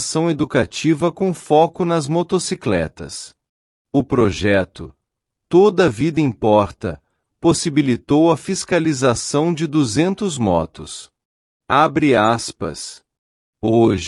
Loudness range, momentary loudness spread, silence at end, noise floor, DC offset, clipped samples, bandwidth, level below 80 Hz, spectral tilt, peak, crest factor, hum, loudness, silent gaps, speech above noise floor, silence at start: 3 LU; 14 LU; 0 s; -79 dBFS; under 0.1%; under 0.1%; 12 kHz; -48 dBFS; -5.5 dB/octave; -2 dBFS; 16 dB; none; -17 LUFS; 3.49-3.85 s, 11.25-11.60 s, 13.19-13.53 s; 62 dB; 0 s